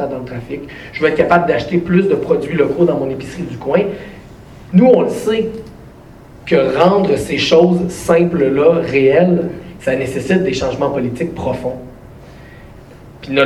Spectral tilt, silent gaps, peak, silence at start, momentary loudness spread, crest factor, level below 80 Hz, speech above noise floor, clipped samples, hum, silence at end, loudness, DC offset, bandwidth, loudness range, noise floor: -6.5 dB/octave; none; 0 dBFS; 0 s; 15 LU; 14 dB; -42 dBFS; 24 dB; under 0.1%; none; 0 s; -15 LUFS; under 0.1%; 13 kHz; 6 LU; -38 dBFS